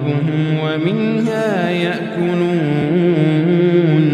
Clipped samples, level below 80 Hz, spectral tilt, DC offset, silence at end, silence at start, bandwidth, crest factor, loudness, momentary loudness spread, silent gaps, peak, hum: under 0.1%; -58 dBFS; -8 dB/octave; under 0.1%; 0 s; 0 s; 9.8 kHz; 12 dB; -16 LUFS; 5 LU; none; -2 dBFS; none